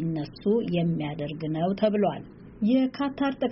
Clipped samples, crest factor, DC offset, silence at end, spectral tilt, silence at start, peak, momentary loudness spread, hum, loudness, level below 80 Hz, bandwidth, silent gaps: under 0.1%; 16 dB; under 0.1%; 0 s; -6.5 dB/octave; 0 s; -12 dBFS; 8 LU; none; -27 LUFS; -56 dBFS; 5.8 kHz; none